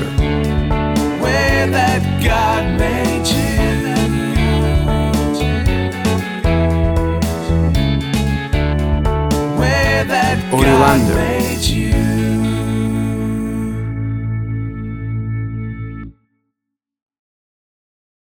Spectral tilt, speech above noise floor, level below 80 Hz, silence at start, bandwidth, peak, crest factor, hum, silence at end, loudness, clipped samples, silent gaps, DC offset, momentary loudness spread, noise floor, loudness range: -6 dB/octave; 68 dB; -24 dBFS; 0 s; 19 kHz; 0 dBFS; 16 dB; none; 2.2 s; -16 LUFS; under 0.1%; none; under 0.1%; 8 LU; -80 dBFS; 10 LU